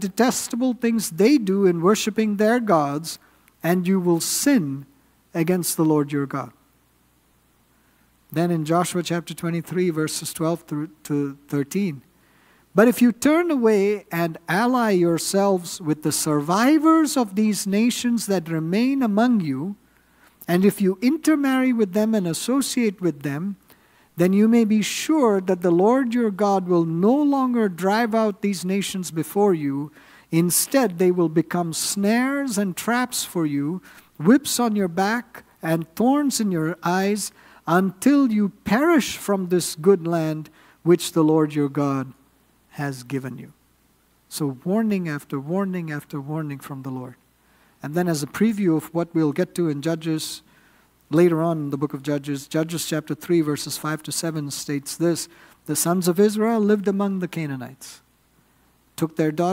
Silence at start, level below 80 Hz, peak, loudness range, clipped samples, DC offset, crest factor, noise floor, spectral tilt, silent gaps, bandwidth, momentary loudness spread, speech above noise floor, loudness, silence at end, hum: 0 s; -64 dBFS; -2 dBFS; 6 LU; under 0.1%; under 0.1%; 20 dB; -61 dBFS; -5 dB/octave; none; 16 kHz; 12 LU; 40 dB; -22 LUFS; 0 s; none